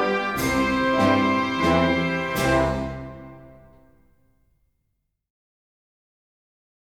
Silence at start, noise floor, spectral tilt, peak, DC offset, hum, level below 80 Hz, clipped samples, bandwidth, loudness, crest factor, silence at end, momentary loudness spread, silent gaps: 0 s; -75 dBFS; -5.5 dB/octave; -6 dBFS; 0.1%; none; -42 dBFS; under 0.1%; 19 kHz; -22 LUFS; 18 dB; 3.3 s; 13 LU; none